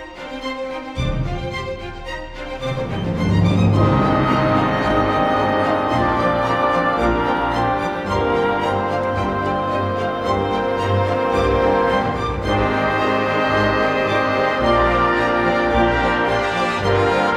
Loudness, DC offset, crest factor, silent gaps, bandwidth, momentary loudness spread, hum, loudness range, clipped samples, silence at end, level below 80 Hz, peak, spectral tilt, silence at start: -18 LUFS; under 0.1%; 14 dB; none; 12 kHz; 9 LU; none; 3 LU; under 0.1%; 0 s; -34 dBFS; -4 dBFS; -6.5 dB/octave; 0 s